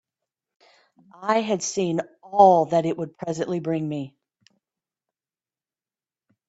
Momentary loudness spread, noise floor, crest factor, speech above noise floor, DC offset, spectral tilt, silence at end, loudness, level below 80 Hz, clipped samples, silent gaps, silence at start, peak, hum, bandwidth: 15 LU; under -90 dBFS; 24 dB; over 68 dB; under 0.1%; -5.5 dB/octave; 2.4 s; -23 LUFS; -68 dBFS; under 0.1%; none; 1.2 s; -2 dBFS; none; 8.2 kHz